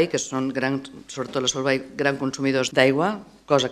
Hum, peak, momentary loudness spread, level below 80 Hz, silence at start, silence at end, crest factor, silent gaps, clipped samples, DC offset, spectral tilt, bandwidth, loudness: none; -2 dBFS; 11 LU; -60 dBFS; 0 s; 0 s; 22 dB; none; under 0.1%; under 0.1%; -4 dB/octave; 13 kHz; -23 LUFS